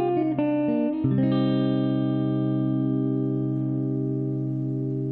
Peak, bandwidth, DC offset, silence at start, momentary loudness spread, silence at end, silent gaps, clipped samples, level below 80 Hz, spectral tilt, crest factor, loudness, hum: -10 dBFS; 4.2 kHz; under 0.1%; 0 s; 5 LU; 0 s; none; under 0.1%; -60 dBFS; -11.5 dB/octave; 14 dB; -25 LUFS; none